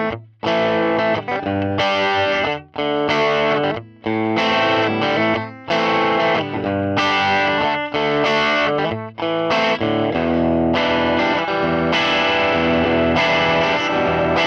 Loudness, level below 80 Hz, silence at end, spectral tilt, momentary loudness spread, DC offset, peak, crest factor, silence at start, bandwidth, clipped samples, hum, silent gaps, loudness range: -18 LUFS; -46 dBFS; 0 s; -5.5 dB/octave; 6 LU; under 0.1%; -6 dBFS; 12 dB; 0 s; 8.4 kHz; under 0.1%; none; none; 2 LU